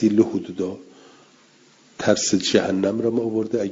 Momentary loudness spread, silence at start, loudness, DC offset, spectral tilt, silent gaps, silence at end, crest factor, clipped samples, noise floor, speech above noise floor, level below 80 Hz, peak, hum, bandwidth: 10 LU; 0 s; -22 LUFS; under 0.1%; -4.5 dB/octave; none; 0 s; 20 dB; under 0.1%; -54 dBFS; 33 dB; -62 dBFS; -2 dBFS; none; 7.8 kHz